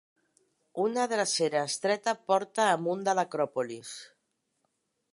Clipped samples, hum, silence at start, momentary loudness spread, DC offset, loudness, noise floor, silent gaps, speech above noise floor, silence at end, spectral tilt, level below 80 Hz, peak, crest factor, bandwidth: under 0.1%; none; 0.75 s; 12 LU; under 0.1%; -29 LUFS; -79 dBFS; none; 50 dB; 1.05 s; -3 dB/octave; -84 dBFS; -12 dBFS; 20 dB; 11.5 kHz